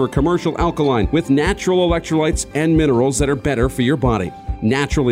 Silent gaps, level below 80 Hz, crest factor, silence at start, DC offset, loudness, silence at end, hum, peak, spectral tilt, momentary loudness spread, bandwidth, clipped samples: none; -28 dBFS; 14 dB; 0 s; under 0.1%; -17 LUFS; 0 s; none; -4 dBFS; -6 dB/octave; 4 LU; 16 kHz; under 0.1%